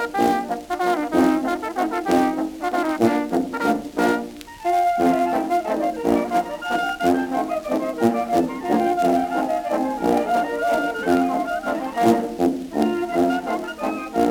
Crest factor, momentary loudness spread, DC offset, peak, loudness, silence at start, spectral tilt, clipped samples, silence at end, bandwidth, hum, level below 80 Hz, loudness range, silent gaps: 16 dB; 6 LU; under 0.1%; -4 dBFS; -21 LUFS; 0 s; -5.5 dB/octave; under 0.1%; 0 s; 19.5 kHz; none; -52 dBFS; 1 LU; none